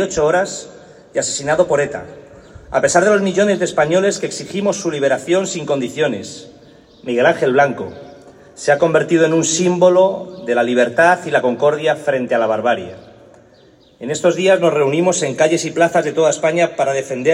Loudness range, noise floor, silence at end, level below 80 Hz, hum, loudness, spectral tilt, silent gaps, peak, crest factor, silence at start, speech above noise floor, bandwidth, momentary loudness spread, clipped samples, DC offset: 4 LU; -48 dBFS; 0 s; -54 dBFS; none; -16 LUFS; -4 dB/octave; none; 0 dBFS; 16 dB; 0 s; 33 dB; 11.5 kHz; 10 LU; under 0.1%; under 0.1%